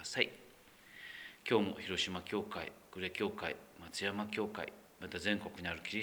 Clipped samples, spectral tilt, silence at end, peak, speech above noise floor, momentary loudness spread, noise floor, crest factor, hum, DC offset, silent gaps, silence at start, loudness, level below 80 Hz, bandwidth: under 0.1%; -4 dB/octave; 0 s; -12 dBFS; 22 dB; 14 LU; -61 dBFS; 28 dB; none; under 0.1%; none; 0 s; -39 LUFS; -70 dBFS; over 20 kHz